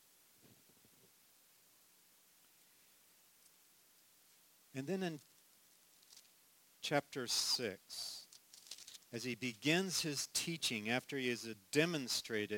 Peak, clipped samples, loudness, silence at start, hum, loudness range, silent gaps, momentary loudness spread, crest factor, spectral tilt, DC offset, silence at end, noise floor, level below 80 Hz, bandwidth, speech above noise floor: -18 dBFS; under 0.1%; -39 LUFS; 4.75 s; none; 12 LU; none; 19 LU; 26 dB; -3 dB/octave; under 0.1%; 0 s; -69 dBFS; -84 dBFS; 17 kHz; 30 dB